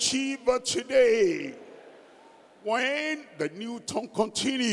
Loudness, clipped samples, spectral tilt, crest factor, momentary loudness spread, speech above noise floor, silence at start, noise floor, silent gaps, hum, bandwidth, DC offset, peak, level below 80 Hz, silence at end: -27 LUFS; under 0.1%; -2.5 dB/octave; 18 dB; 13 LU; 27 dB; 0 s; -54 dBFS; none; none; 12 kHz; under 0.1%; -10 dBFS; -64 dBFS; 0 s